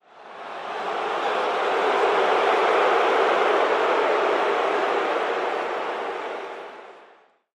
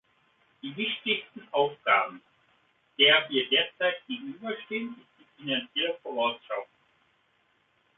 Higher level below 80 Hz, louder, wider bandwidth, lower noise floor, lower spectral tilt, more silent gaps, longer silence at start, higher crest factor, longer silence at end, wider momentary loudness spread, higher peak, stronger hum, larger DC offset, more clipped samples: first, -72 dBFS vs -80 dBFS; first, -22 LUFS vs -27 LUFS; first, 12 kHz vs 4.1 kHz; second, -55 dBFS vs -69 dBFS; second, -3 dB/octave vs -6.5 dB/octave; neither; second, 0.15 s vs 0.65 s; second, 16 dB vs 22 dB; second, 0.55 s vs 1.35 s; about the same, 14 LU vs 16 LU; about the same, -8 dBFS vs -8 dBFS; neither; neither; neither